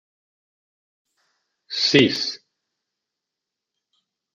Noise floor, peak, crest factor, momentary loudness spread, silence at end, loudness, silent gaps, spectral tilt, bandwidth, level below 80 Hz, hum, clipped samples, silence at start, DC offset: -85 dBFS; -2 dBFS; 26 dB; 15 LU; 2 s; -19 LUFS; none; -4 dB/octave; 7.8 kHz; -68 dBFS; none; under 0.1%; 1.7 s; under 0.1%